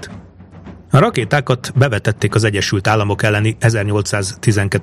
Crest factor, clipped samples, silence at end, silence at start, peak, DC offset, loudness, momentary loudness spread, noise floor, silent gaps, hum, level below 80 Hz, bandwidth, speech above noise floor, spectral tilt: 16 dB; under 0.1%; 0 s; 0 s; 0 dBFS; under 0.1%; -15 LUFS; 4 LU; -38 dBFS; none; none; -44 dBFS; 13.5 kHz; 23 dB; -5.5 dB/octave